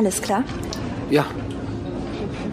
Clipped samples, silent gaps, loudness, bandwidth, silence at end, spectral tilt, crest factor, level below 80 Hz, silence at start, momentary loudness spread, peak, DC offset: under 0.1%; none; -25 LUFS; 15.5 kHz; 0 s; -5 dB/octave; 20 dB; -40 dBFS; 0 s; 8 LU; -4 dBFS; under 0.1%